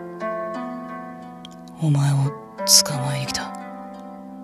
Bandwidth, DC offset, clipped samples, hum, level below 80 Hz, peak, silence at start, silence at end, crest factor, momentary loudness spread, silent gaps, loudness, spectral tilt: 13.5 kHz; under 0.1%; under 0.1%; none; -60 dBFS; 0 dBFS; 0 s; 0 s; 24 dB; 24 LU; none; -20 LUFS; -3.5 dB/octave